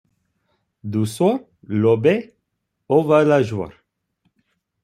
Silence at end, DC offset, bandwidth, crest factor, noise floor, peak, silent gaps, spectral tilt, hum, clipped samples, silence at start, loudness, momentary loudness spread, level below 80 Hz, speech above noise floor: 1.15 s; under 0.1%; 14 kHz; 18 dB; -75 dBFS; -2 dBFS; none; -7.5 dB/octave; none; under 0.1%; 0.85 s; -19 LUFS; 13 LU; -62 dBFS; 58 dB